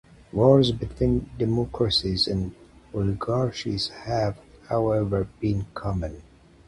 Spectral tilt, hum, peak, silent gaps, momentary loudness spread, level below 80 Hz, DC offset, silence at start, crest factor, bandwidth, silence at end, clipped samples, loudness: -7 dB/octave; none; -4 dBFS; none; 10 LU; -42 dBFS; under 0.1%; 0.35 s; 20 dB; 11.5 kHz; 0.45 s; under 0.1%; -25 LUFS